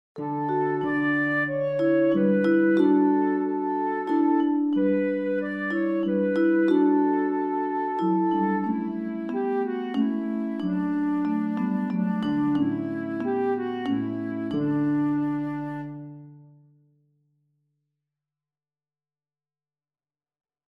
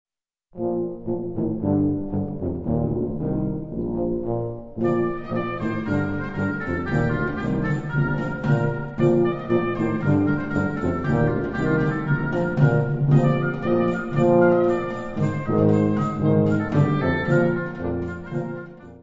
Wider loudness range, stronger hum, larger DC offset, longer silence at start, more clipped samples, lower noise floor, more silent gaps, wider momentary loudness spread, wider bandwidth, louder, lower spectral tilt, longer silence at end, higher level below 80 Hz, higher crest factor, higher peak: about the same, 7 LU vs 5 LU; neither; neither; second, 0.15 s vs 0.55 s; neither; first, under -90 dBFS vs -57 dBFS; neither; about the same, 9 LU vs 9 LU; second, 5.4 kHz vs 7.6 kHz; about the same, -25 LUFS vs -23 LUFS; about the same, -9 dB/octave vs -9.5 dB/octave; first, 4.3 s vs 0.05 s; second, -74 dBFS vs -42 dBFS; about the same, 16 dB vs 16 dB; second, -10 dBFS vs -6 dBFS